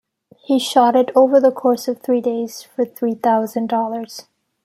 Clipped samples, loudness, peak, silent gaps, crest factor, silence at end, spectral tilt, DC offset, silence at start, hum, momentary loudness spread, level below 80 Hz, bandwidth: under 0.1%; -17 LUFS; -2 dBFS; none; 16 dB; 0.45 s; -4.5 dB/octave; under 0.1%; 0.5 s; none; 12 LU; -70 dBFS; 15.5 kHz